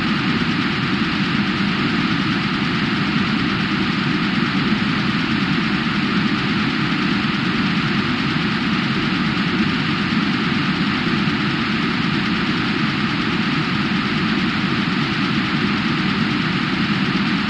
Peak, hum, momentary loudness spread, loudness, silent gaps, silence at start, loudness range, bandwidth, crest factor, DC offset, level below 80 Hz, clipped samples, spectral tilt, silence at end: -6 dBFS; none; 1 LU; -19 LUFS; none; 0 s; 0 LU; 9.8 kHz; 12 dB; under 0.1%; -44 dBFS; under 0.1%; -6 dB/octave; 0 s